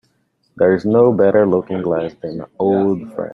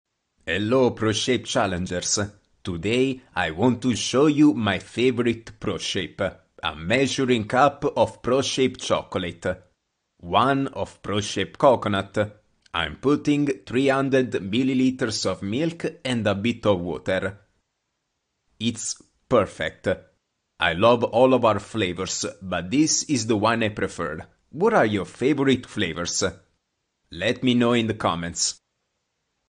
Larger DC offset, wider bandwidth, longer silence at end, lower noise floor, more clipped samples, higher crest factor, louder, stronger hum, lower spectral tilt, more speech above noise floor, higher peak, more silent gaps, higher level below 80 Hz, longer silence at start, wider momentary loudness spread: neither; second, 5.6 kHz vs 10 kHz; second, 0.05 s vs 0.95 s; second, -63 dBFS vs -77 dBFS; neither; about the same, 16 dB vs 20 dB; first, -16 LUFS vs -23 LUFS; neither; first, -10 dB/octave vs -4.5 dB/octave; second, 48 dB vs 55 dB; about the same, -2 dBFS vs -4 dBFS; neither; about the same, -56 dBFS vs -54 dBFS; about the same, 0.55 s vs 0.45 s; about the same, 12 LU vs 10 LU